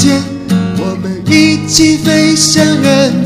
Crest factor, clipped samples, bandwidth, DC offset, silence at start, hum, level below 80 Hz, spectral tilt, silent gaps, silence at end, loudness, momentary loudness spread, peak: 10 dB; 0.2%; 16 kHz; under 0.1%; 0 s; none; -38 dBFS; -4 dB/octave; none; 0 s; -9 LUFS; 8 LU; 0 dBFS